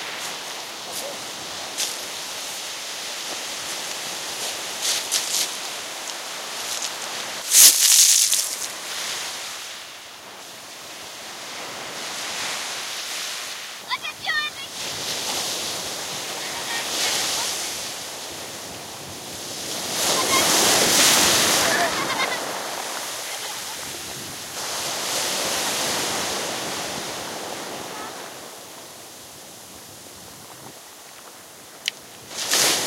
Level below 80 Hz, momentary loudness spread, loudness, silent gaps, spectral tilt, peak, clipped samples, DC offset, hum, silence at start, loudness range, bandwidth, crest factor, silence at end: -64 dBFS; 22 LU; -22 LUFS; none; 0.5 dB/octave; 0 dBFS; under 0.1%; under 0.1%; none; 0 s; 16 LU; 16 kHz; 26 dB; 0 s